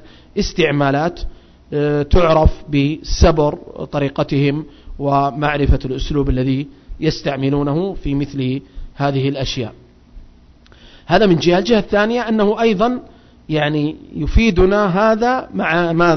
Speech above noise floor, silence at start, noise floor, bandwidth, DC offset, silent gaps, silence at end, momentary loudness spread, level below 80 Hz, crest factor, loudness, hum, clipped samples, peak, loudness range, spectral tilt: 30 dB; 0.05 s; -45 dBFS; 6.4 kHz; under 0.1%; none; 0 s; 11 LU; -26 dBFS; 14 dB; -17 LUFS; none; under 0.1%; -2 dBFS; 4 LU; -6.5 dB/octave